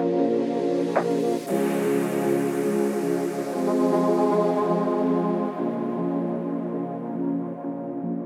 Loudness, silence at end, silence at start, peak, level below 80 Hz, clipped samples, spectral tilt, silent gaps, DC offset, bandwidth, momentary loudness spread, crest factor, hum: -25 LUFS; 0 s; 0 s; -6 dBFS; -80 dBFS; under 0.1%; -7 dB/octave; none; under 0.1%; 16 kHz; 8 LU; 18 dB; none